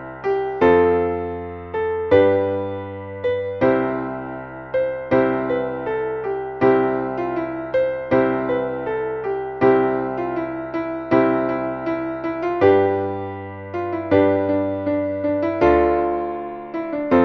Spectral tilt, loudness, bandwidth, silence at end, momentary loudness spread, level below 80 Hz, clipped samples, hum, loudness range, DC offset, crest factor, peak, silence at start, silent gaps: -9 dB/octave; -21 LUFS; 6.2 kHz; 0 s; 12 LU; -46 dBFS; under 0.1%; none; 2 LU; under 0.1%; 18 dB; -2 dBFS; 0 s; none